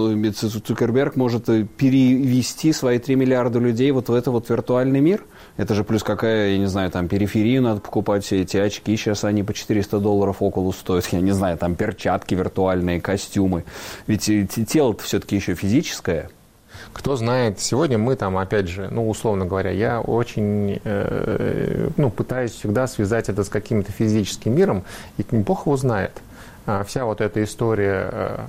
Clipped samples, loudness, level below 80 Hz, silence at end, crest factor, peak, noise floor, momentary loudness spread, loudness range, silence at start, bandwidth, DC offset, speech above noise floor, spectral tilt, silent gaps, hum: under 0.1%; -21 LUFS; -44 dBFS; 0 s; 12 dB; -8 dBFS; -43 dBFS; 6 LU; 4 LU; 0 s; 16 kHz; under 0.1%; 23 dB; -6 dB/octave; none; none